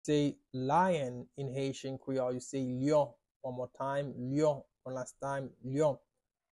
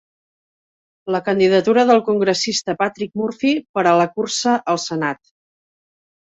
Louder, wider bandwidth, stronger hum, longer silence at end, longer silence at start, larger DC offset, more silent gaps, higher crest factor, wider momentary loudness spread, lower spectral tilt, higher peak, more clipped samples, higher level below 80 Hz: second, -35 LUFS vs -18 LUFS; first, 11.5 kHz vs 8.2 kHz; neither; second, 0.6 s vs 1.05 s; second, 0.05 s vs 1.05 s; neither; about the same, 3.31-3.40 s vs 3.69-3.74 s; about the same, 16 dB vs 16 dB; about the same, 12 LU vs 10 LU; first, -6.5 dB/octave vs -4 dB/octave; second, -18 dBFS vs -2 dBFS; neither; about the same, -68 dBFS vs -64 dBFS